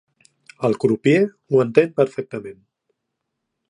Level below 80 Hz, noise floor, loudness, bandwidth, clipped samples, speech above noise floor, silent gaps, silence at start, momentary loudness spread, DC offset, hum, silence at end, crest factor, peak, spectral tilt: -66 dBFS; -78 dBFS; -19 LUFS; 10.5 kHz; under 0.1%; 60 dB; none; 0.6 s; 15 LU; under 0.1%; none; 1.15 s; 20 dB; 0 dBFS; -7.5 dB/octave